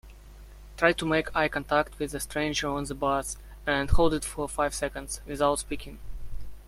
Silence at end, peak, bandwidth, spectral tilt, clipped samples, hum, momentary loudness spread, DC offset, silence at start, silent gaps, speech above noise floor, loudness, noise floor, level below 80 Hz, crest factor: 0 s; -6 dBFS; 15.5 kHz; -4 dB/octave; under 0.1%; 50 Hz at -45 dBFS; 14 LU; under 0.1%; 0.05 s; none; 20 dB; -28 LUFS; -47 dBFS; -38 dBFS; 22 dB